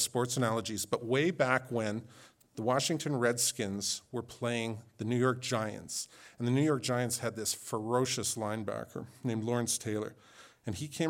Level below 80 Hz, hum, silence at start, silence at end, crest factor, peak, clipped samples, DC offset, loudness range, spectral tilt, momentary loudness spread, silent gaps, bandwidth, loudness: -74 dBFS; none; 0 s; 0 s; 22 dB; -12 dBFS; under 0.1%; under 0.1%; 2 LU; -4 dB/octave; 11 LU; none; 18 kHz; -33 LUFS